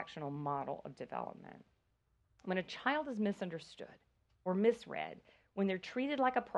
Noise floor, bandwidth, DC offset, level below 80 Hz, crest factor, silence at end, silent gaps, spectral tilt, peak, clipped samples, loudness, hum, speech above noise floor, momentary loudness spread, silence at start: -77 dBFS; 10.5 kHz; under 0.1%; -76 dBFS; 22 dB; 0 s; none; -6.5 dB/octave; -18 dBFS; under 0.1%; -38 LUFS; none; 39 dB; 18 LU; 0 s